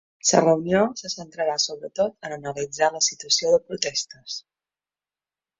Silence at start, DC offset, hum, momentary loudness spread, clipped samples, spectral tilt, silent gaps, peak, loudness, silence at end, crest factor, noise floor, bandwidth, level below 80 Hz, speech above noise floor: 0.25 s; under 0.1%; none; 13 LU; under 0.1%; -2.5 dB/octave; none; -2 dBFS; -23 LUFS; 1.2 s; 22 dB; under -90 dBFS; 8 kHz; -64 dBFS; over 67 dB